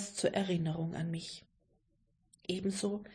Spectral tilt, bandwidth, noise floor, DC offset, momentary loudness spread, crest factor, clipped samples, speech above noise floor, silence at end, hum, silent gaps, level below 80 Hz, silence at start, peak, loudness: -5 dB/octave; 10.5 kHz; -75 dBFS; under 0.1%; 13 LU; 20 dB; under 0.1%; 39 dB; 0 s; none; none; -68 dBFS; 0 s; -18 dBFS; -36 LUFS